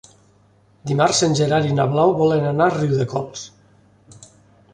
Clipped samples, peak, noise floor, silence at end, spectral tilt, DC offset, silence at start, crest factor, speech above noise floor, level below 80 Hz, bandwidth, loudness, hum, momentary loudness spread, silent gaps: under 0.1%; -4 dBFS; -55 dBFS; 1.25 s; -5.5 dB/octave; under 0.1%; 0.85 s; 18 dB; 37 dB; -54 dBFS; 11 kHz; -18 LUFS; none; 16 LU; none